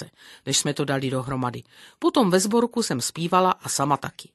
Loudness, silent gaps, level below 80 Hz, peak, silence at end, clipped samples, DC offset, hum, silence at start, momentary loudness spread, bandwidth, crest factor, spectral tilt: -23 LUFS; none; -60 dBFS; -4 dBFS; 0.1 s; under 0.1%; under 0.1%; none; 0 s; 9 LU; 12.5 kHz; 20 dB; -4 dB/octave